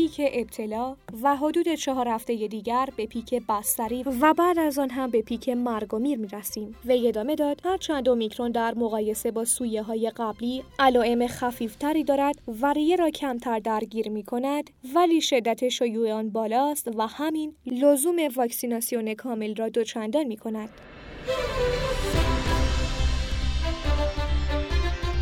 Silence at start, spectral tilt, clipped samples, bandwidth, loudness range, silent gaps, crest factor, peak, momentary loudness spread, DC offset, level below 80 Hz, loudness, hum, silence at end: 0 s; -5 dB/octave; under 0.1%; 18 kHz; 3 LU; none; 18 dB; -6 dBFS; 9 LU; under 0.1%; -36 dBFS; -26 LUFS; none; 0 s